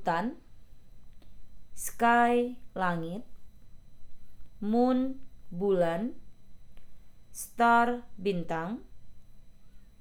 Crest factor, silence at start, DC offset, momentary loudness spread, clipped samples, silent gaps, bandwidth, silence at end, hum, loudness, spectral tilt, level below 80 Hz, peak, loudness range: 18 dB; 0 s; under 0.1%; 18 LU; under 0.1%; none; over 20 kHz; 0.05 s; none; -29 LUFS; -5.5 dB/octave; -54 dBFS; -12 dBFS; 2 LU